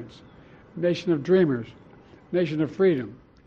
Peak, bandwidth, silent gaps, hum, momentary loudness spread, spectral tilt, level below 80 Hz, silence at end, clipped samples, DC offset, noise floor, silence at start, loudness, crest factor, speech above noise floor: -10 dBFS; 7 kHz; none; none; 20 LU; -8 dB/octave; -62 dBFS; 0.35 s; under 0.1%; under 0.1%; -49 dBFS; 0 s; -24 LUFS; 16 dB; 26 dB